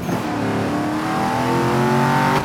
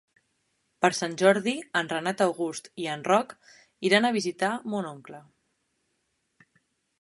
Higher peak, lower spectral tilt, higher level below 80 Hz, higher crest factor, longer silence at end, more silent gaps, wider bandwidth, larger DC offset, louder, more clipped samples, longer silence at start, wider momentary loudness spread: about the same, -6 dBFS vs -4 dBFS; first, -6 dB/octave vs -4 dB/octave; first, -46 dBFS vs -76 dBFS; second, 14 dB vs 24 dB; second, 0 s vs 1.8 s; neither; first, 17.5 kHz vs 11.5 kHz; neither; first, -19 LUFS vs -26 LUFS; neither; second, 0 s vs 0.8 s; second, 5 LU vs 12 LU